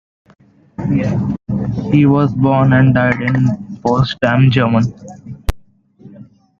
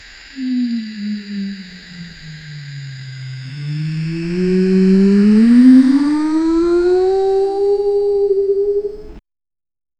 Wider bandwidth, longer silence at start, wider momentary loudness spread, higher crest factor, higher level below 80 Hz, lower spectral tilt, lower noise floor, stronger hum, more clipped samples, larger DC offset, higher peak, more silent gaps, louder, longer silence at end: second, 7.2 kHz vs 9.2 kHz; first, 0.8 s vs 0.2 s; second, 15 LU vs 22 LU; about the same, 14 dB vs 14 dB; first, -34 dBFS vs -44 dBFS; about the same, -8 dB/octave vs -8.5 dB/octave; second, -44 dBFS vs under -90 dBFS; neither; neither; neither; about the same, 0 dBFS vs 0 dBFS; neither; about the same, -14 LUFS vs -14 LUFS; second, 0.35 s vs 0.8 s